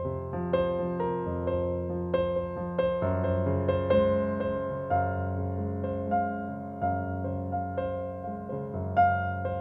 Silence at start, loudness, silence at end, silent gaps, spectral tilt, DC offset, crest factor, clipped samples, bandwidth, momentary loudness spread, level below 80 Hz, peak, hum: 0 s; -30 LUFS; 0 s; none; -10.5 dB/octave; under 0.1%; 16 dB; under 0.1%; 4.5 kHz; 9 LU; -50 dBFS; -12 dBFS; none